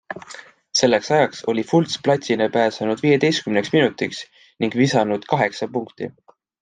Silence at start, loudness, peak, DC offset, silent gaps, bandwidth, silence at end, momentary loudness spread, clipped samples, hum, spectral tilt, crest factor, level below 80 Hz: 0.1 s; -20 LUFS; -2 dBFS; under 0.1%; none; 9.6 kHz; 0.5 s; 16 LU; under 0.1%; none; -5 dB/octave; 18 dB; -64 dBFS